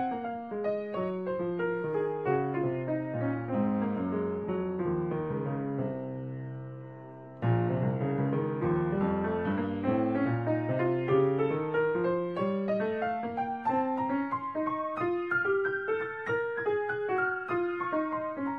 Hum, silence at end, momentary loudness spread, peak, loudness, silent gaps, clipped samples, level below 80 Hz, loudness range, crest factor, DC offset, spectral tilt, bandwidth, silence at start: none; 0 s; 5 LU; -14 dBFS; -31 LUFS; none; under 0.1%; -62 dBFS; 4 LU; 16 dB; under 0.1%; -10 dB/octave; 5.4 kHz; 0 s